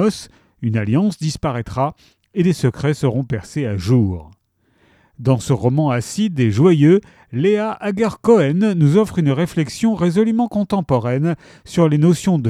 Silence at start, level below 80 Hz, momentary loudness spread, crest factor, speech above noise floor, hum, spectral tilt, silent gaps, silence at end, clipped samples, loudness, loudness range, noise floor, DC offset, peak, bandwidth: 0 s; -46 dBFS; 9 LU; 16 dB; 43 dB; none; -7.5 dB/octave; none; 0 s; under 0.1%; -17 LUFS; 5 LU; -60 dBFS; under 0.1%; 0 dBFS; 14 kHz